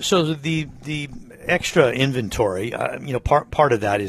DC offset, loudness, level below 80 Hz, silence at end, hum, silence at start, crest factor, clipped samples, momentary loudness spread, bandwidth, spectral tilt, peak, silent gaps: under 0.1%; -21 LUFS; -42 dBFS; 0 s; none; 0 s; 18 dB; under 0.1%; 11 LU; 13.5 kHz; -5 dB/octave; -4 dBFS; none